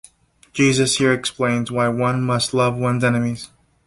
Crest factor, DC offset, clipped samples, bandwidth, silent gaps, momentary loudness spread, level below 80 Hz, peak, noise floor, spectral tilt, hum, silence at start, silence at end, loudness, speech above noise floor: 16 dB; under 0.1%; under 0.1%; 11.5 kHz; none; 9 LU; -52 dBFS; -4 dBFS; -54 dBFS; -4.5 dB/octave; none; 0.55 s; 0.4 s; -19 LUFS; 35 dB